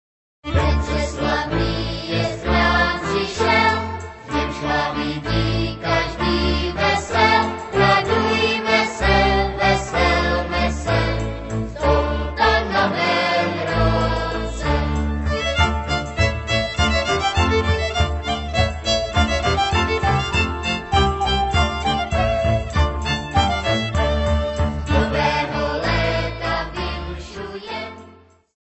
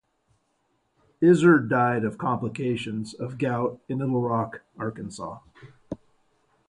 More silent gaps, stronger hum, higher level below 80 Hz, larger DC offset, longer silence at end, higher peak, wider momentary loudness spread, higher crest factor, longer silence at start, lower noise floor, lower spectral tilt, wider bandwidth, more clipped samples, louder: neither; neither; first, -28 dBFS vs -62 dBFS; neither; second, 0.6 s vs 0.75 s; first, -2 dBFS vs -6 dBFS; second, 7 LU vs 20 LU; about the same, 18 dB vs 20 dB; second, 0.45 s vs 1.2 s; second, -48 dBFS vs -71 dBFS; second, -5 dB/octave vs -7.5 dB/octave; second, 8.4 kHz vs 10.5 kHz; neither; first, -20 LUFS vs -25 LUFS